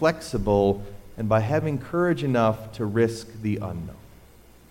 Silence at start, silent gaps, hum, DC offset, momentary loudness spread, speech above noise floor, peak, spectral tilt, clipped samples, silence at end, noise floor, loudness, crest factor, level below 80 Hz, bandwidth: 0 s; none; none; under 0.1%; 11 LU; 27 dB; -8 dBFS; -7 dB/octave; under 0.1%; 0.65 s; -51 dBFS; -25 LUFS; 16 dB; -44 dBFS; 16.5 kHz